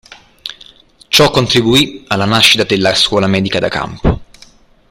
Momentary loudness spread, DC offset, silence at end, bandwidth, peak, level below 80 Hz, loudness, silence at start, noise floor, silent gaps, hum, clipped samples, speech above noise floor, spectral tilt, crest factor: 17 LU; under 0.1%; 0.65 s; over 20 kHz; 0 dBFS; -30 dBFS; -11 LUFS; 0.45 s; -44 dBFS; none; none; under 0.1%; 32 dB; -4 dB/octave; 14 dB